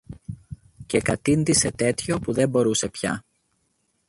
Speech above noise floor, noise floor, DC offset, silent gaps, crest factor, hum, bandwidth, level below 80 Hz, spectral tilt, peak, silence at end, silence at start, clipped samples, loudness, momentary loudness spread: 48 dB; -70 dBFS; under 0.1%; none; 18 dB; none; 11.5 kHz; -48 dBFS; -4.5 dB/octave; -6 dBFS; 0.9 s; 0.1 s; under 0.1%; -23 LUFS; 20 LU